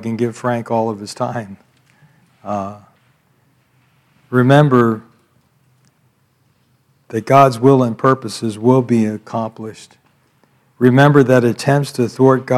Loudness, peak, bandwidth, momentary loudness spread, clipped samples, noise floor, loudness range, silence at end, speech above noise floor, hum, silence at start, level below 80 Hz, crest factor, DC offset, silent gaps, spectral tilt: -15 LUFS; 0 dBFS; 14 kHz; 16 LU; 0.1%; -59 dBFS; 9 LU; 0 s; 45 dB; none; 0 s; -62 dBFS; 16 dB; under 0.1%; none; -7 dB/octave